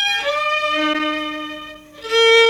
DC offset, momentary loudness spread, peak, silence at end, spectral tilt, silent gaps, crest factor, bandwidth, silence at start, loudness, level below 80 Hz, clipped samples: under 0.1%; 18 LU; -4 dBFS; 0 s; -1 dB/octave; none; 14 dB; 14.5 kHz; 0 s; -18 LUFS; -56 dBFS; under 0.1%